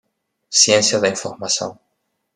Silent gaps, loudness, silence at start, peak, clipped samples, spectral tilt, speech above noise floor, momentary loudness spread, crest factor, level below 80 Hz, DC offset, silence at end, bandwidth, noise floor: none; -16 LUFS; 0.5 s; 0 dBFS; under 0.1%; -1.5 dB/octave; 55 dB; 12 LU; 20 dB; -68 dBFS; under 0.1%; 0.6 s; 12.5 kHz; -72 dBFS